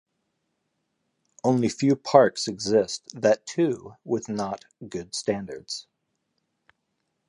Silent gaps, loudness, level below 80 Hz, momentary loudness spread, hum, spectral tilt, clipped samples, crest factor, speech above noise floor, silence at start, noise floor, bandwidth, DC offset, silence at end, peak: none; -25 LUFS; -64 dBFS; 16 LU; none; -5 dB/octave; under 0.1%; 24 dB; 53 dB; 1.45 s; -77 dBFS; 11 kHz; under 0.1%; 1.5 s; -2 dBFS